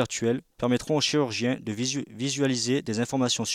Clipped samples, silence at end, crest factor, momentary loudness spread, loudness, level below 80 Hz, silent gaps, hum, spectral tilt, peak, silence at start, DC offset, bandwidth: under 0.1%; 0 s; 16 dB; 5 LU; -26 LUFS; -60 dBFS; none; none; -4 dB/octave; -12 dBFS; 0 s; under 0.1%; 15 kHz